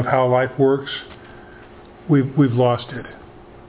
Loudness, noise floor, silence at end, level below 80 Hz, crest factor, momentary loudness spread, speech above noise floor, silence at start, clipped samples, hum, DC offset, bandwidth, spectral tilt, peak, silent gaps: -19 LUFS; -42 dBFS; 0.45 s; -52 dBFS; 18 dB; 22 LU; 24 dB; 0 s; under 0.1%; none; under 0.1%; 4 kHz; -11.5 dB/octave; -2 dBFS; none